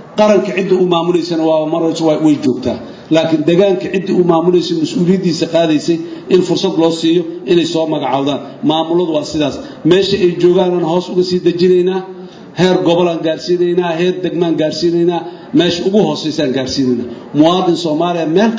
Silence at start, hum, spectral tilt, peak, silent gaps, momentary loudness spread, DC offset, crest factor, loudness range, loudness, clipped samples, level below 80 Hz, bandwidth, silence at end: 0 s; none; -6 dB/octave; 0 dBFS; none; 6 LU; under 0.1%; 12 dB; 1 LU; -13 LUFS; under 0.1%; -50 dBFS; 8 kHz; 0 s